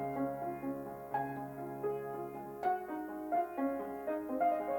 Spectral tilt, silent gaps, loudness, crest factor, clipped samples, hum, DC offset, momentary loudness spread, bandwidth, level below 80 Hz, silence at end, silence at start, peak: -8 dB/octave; none; -38 LUFS; 16 dB; under 0.1%; none; under 0.1%; 9 LU; 18 kHz; -70 dBFS; 0 s; 0 s; -22 dBFS